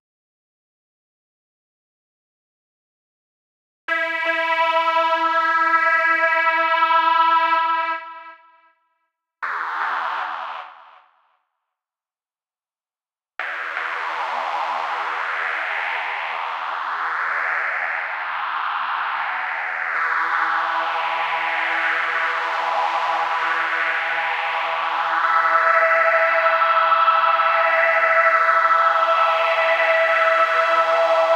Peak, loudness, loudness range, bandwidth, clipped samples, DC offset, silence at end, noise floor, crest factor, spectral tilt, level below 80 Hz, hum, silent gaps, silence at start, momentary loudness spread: -4 dBFS; -19 LUFS; 13 LU; 16 kHz; under 0.1%; under 0.1%; 0 s; under -90 dBFS; 16 dB; -1 dB/octave; under -90 dBFS; none; none; 3.9 s; 10 LU